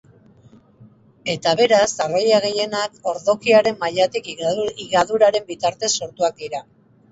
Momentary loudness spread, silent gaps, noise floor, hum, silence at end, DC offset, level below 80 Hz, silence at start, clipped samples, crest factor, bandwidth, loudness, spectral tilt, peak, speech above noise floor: 9 LU; none; -50 dBFS; none; 0.5 s; under 0.1%; -60 dBFS; 1.25 s; under 0.1%; 18 dB; 8 kHz; -19 LUFS; -3 dB/octave; -2 dBFS; 31 dB